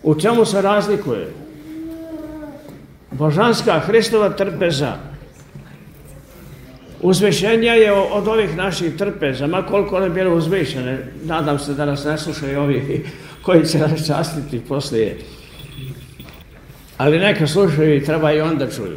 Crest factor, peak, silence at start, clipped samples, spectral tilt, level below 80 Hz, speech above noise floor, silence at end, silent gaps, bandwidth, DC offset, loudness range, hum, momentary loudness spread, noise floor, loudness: 18 dB; 0 dBFS; 0.05 s; under 0.1%; -6 dB/octave; -44 dBFS; 24 dB; 0 s; none; 16 kHz; under 0.1%; 5 LU; none; 19 LU; -41 dBFS; -17 LUFS